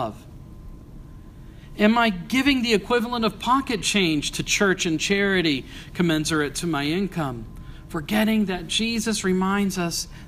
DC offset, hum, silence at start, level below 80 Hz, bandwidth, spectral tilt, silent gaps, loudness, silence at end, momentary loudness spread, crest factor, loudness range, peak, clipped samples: under 0.1%; none; 0 s; -44 dBFS; 15.5 kHz; -4 dB/octave; none; -22 LUFS; 0 s; 11 LU; 20 dB; 3 LU; -2 dBFS; under 0.1%